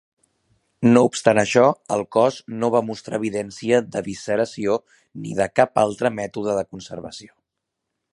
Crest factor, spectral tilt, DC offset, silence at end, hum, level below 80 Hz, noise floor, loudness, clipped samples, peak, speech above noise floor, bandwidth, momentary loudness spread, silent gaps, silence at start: 20 dB; -5.5 dB/octave; under 0.1%; 0.85 s; none; -58 dBFS; -81 dBFS; -21 LUFS; under 0.1%; 0 dBFS; 60 dB; 11.5 kHz; 15 LU; none; 0.8 s